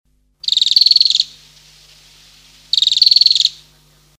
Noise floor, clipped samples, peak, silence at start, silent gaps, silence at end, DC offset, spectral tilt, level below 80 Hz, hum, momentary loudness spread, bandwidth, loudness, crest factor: -51 dBFS; under 0.1%; 0 dBFS; 0.45 s; none; 0.65 s; under 0.1%; 3 dB/octave; -58 dBFS; 50 Hz at -55 dBFS; 9 LU; over 20 kHz; -10 LUFS; 16 dB